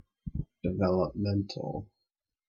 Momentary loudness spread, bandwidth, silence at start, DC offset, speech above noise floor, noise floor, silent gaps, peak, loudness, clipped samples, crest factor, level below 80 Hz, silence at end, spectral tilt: 12 LU; 7 kHz; 0.25 s; under 0.1%; 56 dB; -86 dBFS; none; -14 dBFS; -32 LUFS; under 0.1%; 18 dB; -50 dBFS; 0.65 s; -8.5 dB/octave